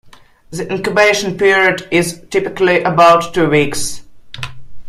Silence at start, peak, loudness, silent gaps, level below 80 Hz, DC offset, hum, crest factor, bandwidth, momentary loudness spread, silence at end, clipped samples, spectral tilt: 0.5 s; 0 dBFS; -13 LUFS; none; -46 dBFS; under 0.1%; none; 14 dB; 15.5 kHz; 19 LU; 0 s; under 0.1%; -4 dB/octave